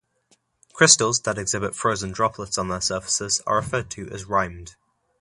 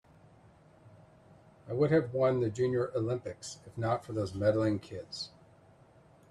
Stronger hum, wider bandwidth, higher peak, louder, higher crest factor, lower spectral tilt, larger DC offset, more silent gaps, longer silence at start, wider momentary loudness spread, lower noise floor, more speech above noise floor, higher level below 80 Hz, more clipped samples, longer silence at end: neither; about the same, 11.5 kHz vs 12 kHz; first, 0 dBFS vs -16 dBFS; first, -21 LUFS vs -32 LUFS; first, 24 dB vs 18 dB; second, -2 dB/octave vs -6.5 dB/octave; neither; neither; about the same, 0.75 s vs 0.85 s; about the same, 13 LU vs 14 LU; first, -65 dBFS vs -60 dBFS; first, 42 dB vs 29 dB; first, -50 dBFS vs -66 dBFS; neither; second, 0.5 s vs 1.05 s